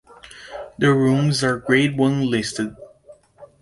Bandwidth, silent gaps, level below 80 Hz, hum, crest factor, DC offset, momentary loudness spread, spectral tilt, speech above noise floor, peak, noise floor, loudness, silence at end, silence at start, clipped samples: 11.5 kHz; none; -54 dBFS; none; 18 dB; under 0.1%; 19 LU; -5.5 dB/octave; 31 dB; -4 dBFS; -49 dBFS; -19 LUFS; 0.15 s; 0.25 s; under 0.1%